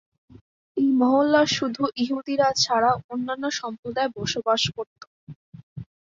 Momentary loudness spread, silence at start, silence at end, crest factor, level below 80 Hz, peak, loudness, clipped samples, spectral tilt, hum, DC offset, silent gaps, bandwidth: 16 LU; 0.75 s; 0.2 s; 18 dB; -60 dBFS; -6 dBFS; -23 LUFS; under 0.1%; -4 dB/octave; none; under 0.1%; 3.04-3.09 s, 3.79-3.83 s, 4.87-4.96 s, 5.07-5.27 s, 5.36-5.52 s, 5.63-5.76 s; 7.6 kHz